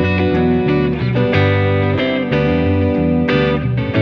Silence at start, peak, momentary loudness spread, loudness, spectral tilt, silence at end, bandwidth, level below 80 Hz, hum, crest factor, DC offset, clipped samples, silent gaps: 0 s; -2 dBFS; 3 LU; -15 LUFS; -9 dB/octave; 0 s; 6.2 kHz; -32 dBFS; none; 12 dB; under 0.1%; under 0.1%; none